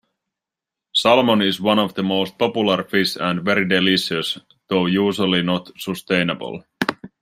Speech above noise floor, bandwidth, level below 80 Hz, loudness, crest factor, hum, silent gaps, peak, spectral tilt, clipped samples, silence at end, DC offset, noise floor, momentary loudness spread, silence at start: 67 dB; 15.5 kHz; -62 dBFS; -19 LUFS; 18 dB; none; none; -2 dBFS; -5 dB/octave; under 0.1%; 0.15 s; under 0.1%; -86 dBFS; 9 LU; 0.95 s